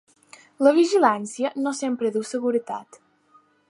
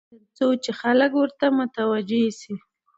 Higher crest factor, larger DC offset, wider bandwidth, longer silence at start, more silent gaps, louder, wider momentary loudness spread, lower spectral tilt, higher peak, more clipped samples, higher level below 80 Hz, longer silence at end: about the same, 20 dB vs 18 dB; neither; first, 11.5 kHz vs 8 kHz; first, 0.6 s vs 0.4 s; neither; about the same, -22 LUFS vs -22 LUFS; about the same, 10 LU vs 12 LU; about the same, -4 dB/octave vs -5 dB/octave; about the same, -4 dBFS vs -6 dBFS; neither; second, -80 dBFS vs -74 dBFS; first, 0.85 s vs 0.4 s